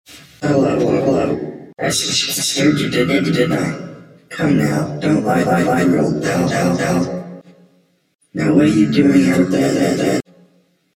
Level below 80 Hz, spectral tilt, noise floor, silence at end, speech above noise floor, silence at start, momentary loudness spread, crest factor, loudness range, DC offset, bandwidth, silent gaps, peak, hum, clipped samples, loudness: -50 dBFS; -5 dB/octave; -57 dBFS; 0.75 s; 42 dB; 0.1 s; 11 LU; 16 dB; 2 LU; under 0.1%; 16.5 kHz; 8.15-8.19 s; 0 dBFS; none; under 0.1%; -16 LUFS